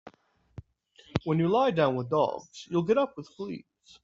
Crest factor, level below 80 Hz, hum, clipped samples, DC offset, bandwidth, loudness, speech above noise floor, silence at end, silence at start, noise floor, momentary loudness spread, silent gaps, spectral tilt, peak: 22 dB; -60 dBFS; none; under 0.1%; under 0.1%; 7.8 kHz; -28 LUFS; 35 dB; 0.45 s; 0.05 s; -62 dBFS; 15 LU; none; -7 dB/octave; -8 dBFS